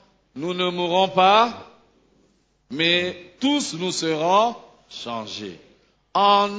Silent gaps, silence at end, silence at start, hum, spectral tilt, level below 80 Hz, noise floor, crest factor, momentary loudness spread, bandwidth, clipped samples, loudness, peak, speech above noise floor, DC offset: none; 0 s; 0.35 s; none; -3.5 dB/octave; -64 dBFS; -63 dBFS; 20 dB; 19 LU; 8 kHz; under 0.1%; -21 LUFS; -4 dBFS; 42 dB; under 0.1%